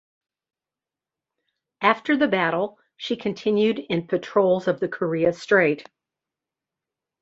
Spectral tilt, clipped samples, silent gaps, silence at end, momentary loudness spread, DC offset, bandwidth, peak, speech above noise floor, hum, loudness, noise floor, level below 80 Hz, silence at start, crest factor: -6.5 dB/octave; under 0.1%; none; 1.4 s; 8 LU; under 0.1%; 8 kHz; -4 dBFS; 68 dB; none; -22 LUFS; -90 dBFS; -64 dBFS; 1.8 s; 22 dB